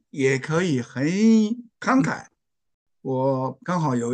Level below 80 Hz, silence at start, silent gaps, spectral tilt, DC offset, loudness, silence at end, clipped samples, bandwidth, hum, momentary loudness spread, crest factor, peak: -68 dBFS; 0.15 s; 2.74-2.86 s; -6.5 dB/octave; under 0.1%; -23 LUFS; 0 s; under 0.1%; 9.2 kHz; none; 10 LU; 16 dB; -8 dBFS